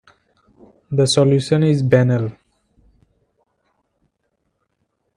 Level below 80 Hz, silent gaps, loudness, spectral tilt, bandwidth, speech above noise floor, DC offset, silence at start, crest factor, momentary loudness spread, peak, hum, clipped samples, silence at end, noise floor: -56 dBFS; none; -16 LUFS; -6 dB/octave; 11 kHz; 56 dB; under 0.1%; 0.9 s; 20 dB; 8 LU; 0 dBFS; none; under 0.1%; 2.85 s; -71 dBFS